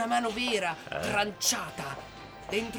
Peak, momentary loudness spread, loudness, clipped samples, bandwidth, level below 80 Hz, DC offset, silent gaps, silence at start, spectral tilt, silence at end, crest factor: -14 dBFS; 14 LU; -30 LUFS; under 0.1%; over 20 kHz; -58 dBFS; under 0.1%; none; 0 s; -2 dB/octave; 0 s; 18 dB